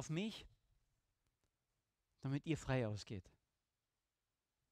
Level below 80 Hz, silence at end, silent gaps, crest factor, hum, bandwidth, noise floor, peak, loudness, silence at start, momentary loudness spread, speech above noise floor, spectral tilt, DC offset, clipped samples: -68 dBFS; 1.5 s; none; 20 dB; none; 12.5 kHz; under -90 dBFS; -28 dBFS; -44 LUFS; 0 s; 12 LU; over 47 dB; -6 dB/octave; under 0.1%; under 0.1%